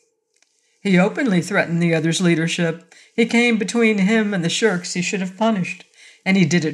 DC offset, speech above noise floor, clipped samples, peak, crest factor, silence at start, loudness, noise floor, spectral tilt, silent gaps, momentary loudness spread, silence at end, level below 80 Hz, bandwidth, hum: under 0.1%; 46 dB; under 0.1%; -4 dBFS; 16 dB; 0.85 s; -19 LUFS; -64 dBFS; -5 dB/octave; none; 8 LU; 0 s; -70 dBFS; 11.5 kHz; none